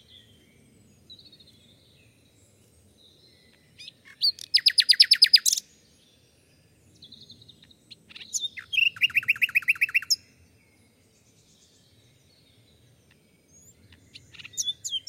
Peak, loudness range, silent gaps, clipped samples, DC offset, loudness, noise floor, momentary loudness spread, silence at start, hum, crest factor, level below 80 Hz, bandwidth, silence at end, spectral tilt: -4 dBFS; 14 LU; none; under 0.1%; under 0.1%; -21 LUFS; -61 dBFS; 28 LU; 1.1 s; none; 26 dB; -72 dBFS; 16.5 kHz; 0.1 s; 3 dB/octave